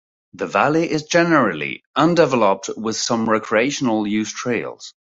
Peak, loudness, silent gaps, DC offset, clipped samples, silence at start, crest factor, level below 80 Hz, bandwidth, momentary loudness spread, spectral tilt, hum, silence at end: -2 dBFS; -19 LUFS; 1.86-1.94 s; under 0.1%; under 0.1%; 0.35 s; 18 dB; -60 dBFS; 8 kHz; 9 LU; -4.5 dB/octave; none; 0.25 s